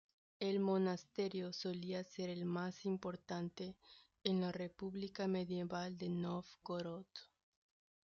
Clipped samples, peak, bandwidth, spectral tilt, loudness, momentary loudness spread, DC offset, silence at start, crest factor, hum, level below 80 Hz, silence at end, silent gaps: under 0.1%; -20 dBFS; 7.2 kHz; -5.5 dB/octave; -43 LUFS; 9 LU; under 0.1%; 0.4 s; 22 dB; none; -78 dBFS; 0.9 s; none